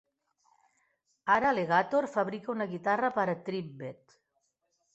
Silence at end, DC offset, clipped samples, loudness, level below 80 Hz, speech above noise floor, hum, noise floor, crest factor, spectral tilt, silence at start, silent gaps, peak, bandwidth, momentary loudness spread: 1 s; under 0.1%; under 0.1%; -30 LUFS; -72 dBFS; 49 dB; none; -79 dBFS; 20 dB; -6.5 dB/octave; 1.25 s; none; -12 dBFS; 8.2 kHz; 13 LU